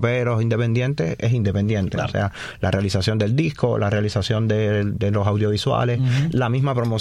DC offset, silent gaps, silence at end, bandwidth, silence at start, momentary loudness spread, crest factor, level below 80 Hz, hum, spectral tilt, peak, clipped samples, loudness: under 0.1%; none; 0 s; 11 kHz; 0 s; 3 LU; 14 dB; -44 dBFS; none; -7 dB/octave; -6 dBFS; under 0.1%; -21 LUFS